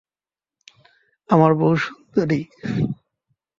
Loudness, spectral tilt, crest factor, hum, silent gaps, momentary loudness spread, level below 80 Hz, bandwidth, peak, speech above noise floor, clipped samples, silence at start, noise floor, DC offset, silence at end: -20 LUFS; -8.5 dB/octave; 20 dB; none; none; 11 LU; -56 dBFS; 7.4 kHz; -2 dBFS; over 71 dB; under 0.1%; 1.3 s; under -90 dBFS; under 0.1%; 0.65 s